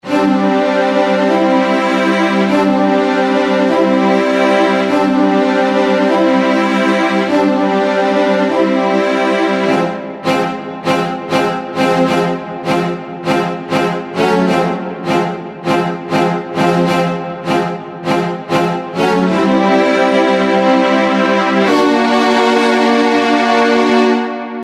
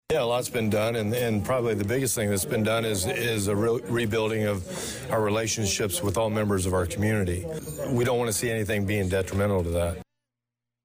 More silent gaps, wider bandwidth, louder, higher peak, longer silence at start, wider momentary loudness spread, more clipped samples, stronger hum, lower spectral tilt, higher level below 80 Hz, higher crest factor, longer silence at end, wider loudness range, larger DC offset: neither; second, 14 kHz vs 16 kHz; first, -13 LUFS vs -26 LUFS; first, 0 dBFS vs -16 dBFS; about the same, 0.05 s vs 0.1 s; about the same, 6 LU vs 4 LU; neither; neither; about the same, -6 dB/octave vs -5 dB/octave; second, -54 dBFS vs -48 dBFS; about the same, 12 dB vs 10 dB; second, 0 s vs 0.8 s; first, 5 LU vs 1 LU; neither